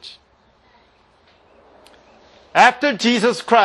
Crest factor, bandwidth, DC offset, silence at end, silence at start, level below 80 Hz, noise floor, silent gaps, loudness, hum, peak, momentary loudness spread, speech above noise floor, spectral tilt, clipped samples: 20 dB; 12 kHz; under 0.1%; 0 s; 0.05 s; -64 dBFS; -56 dBFS; none; -15 LUFS; none; 0 dBFS; 8 LU; 41 dB; -3.5 dB/octave; under 0.1%